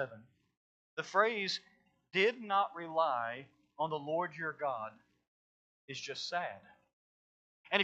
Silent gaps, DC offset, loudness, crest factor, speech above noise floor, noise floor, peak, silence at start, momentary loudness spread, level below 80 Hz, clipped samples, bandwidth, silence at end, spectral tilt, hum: 0.57-0.97 s, 5.27-5.88 s, 6.93-7.64 s; under 0.1%; -35 LUFS; 24 dB; over 54 dB; under -90 dBFS; -12 dBFS; 0 s; 13 LU; -88 dBFS; under 0.1%; 8.4 kHz; 0 s; -3.5 dB/octave; none